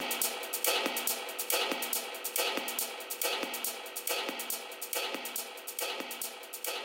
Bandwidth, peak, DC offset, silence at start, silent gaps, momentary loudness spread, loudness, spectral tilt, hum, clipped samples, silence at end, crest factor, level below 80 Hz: 17 kHz; -12 dBFS; under 0.1%; 0 s; none; 7 LU; -33 LUFS; 1 dB/octave; none; under 0.1%; 0 s; 22 dB; under -90 dBFS